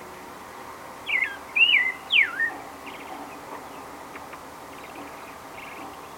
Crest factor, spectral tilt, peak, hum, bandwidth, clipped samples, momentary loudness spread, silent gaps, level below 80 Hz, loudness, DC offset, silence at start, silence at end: 20 dB; -1 dB/octave; -8 dBFS; none; 17 kHz; under 0.1%; 21 LU; none; -62 dBFS; -21 LUFS; under 0.1%; 0 s; 0 s